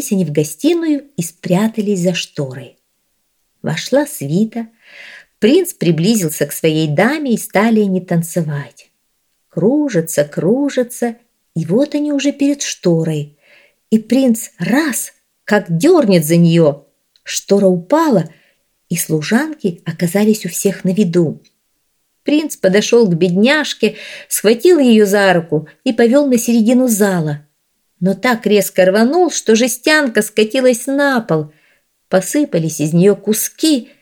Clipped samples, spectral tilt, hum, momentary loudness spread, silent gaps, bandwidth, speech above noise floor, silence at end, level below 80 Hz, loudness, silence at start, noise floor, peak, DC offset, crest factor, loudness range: under 0.1%; -5 dB/octave; none; 11 LU; none; 19.5 kHz; 51 dB; 0.15 s; -64 dBFS; -14 LUFS; 0 s; -65 dBFS; 0 dBFS; under 0.1%; 14 dB; 5 LU